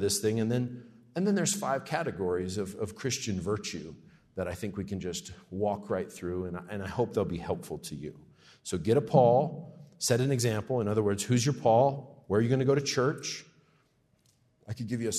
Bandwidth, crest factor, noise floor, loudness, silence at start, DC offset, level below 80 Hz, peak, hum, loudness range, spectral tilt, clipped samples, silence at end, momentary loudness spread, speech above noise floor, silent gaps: 13.5 kHz; 20 dB; -69 dBFS; -30 LUFS; 0 s; under 0.1%; -64 dBFS; -10 dBFS; none; 8 LU; -5 dB/octave; under 0.1%; 0 s; 15 LU; 39 dB; none